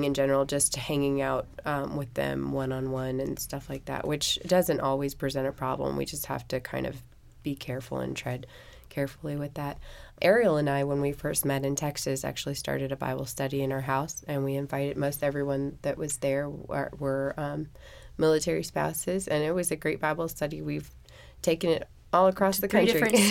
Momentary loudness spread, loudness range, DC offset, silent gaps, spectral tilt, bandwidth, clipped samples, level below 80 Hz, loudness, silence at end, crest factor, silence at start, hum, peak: 11 LU; 5 LU; under 0.1%; none; -4.5 dB/octave; 17 kHz; under 0.1%; -52 dBFS; -29 LUFS; 0 s; 20 dB; 0 s; none; -8 dBFS